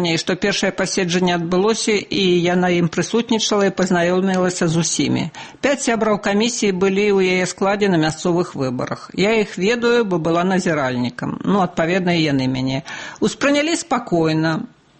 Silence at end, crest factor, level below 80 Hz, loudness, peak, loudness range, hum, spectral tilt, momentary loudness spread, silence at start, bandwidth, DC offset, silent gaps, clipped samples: 0.35 s; 12 dB; -52 dBFS; -18 LUFS; -6 dBFS; 2 LU; none; -4.5 dB/octave; 6 LU; 0 s; 8.8 kHz; under 0.1%; none; under 0.1%